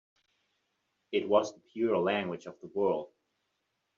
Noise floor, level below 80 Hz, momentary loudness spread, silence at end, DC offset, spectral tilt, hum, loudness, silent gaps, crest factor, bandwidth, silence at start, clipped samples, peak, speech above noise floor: -81 dBFS; -78 dBFS; 12 LU; 0.9 s; under 0.1%; -4 dB/octave; none; -31 LUFS; none; 22 dB; 7.4 kHz; 1.1 s; under 0.1%; -12 dBFS; 50 dB